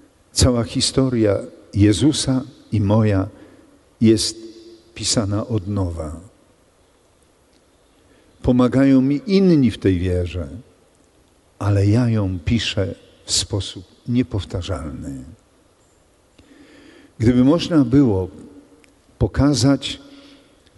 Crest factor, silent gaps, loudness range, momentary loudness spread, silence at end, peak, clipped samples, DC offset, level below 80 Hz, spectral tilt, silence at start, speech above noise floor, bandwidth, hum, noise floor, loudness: 16 dB; none; 7 LU; 16 LU; 0.6 s; -4 dBFS; under 0.1%; under 0.1%; -38 dBFS; -5.5 dB/octave; 0.35 s; 39 dB; 11.5 kHz; none; -56 dBFS; -19 LUFS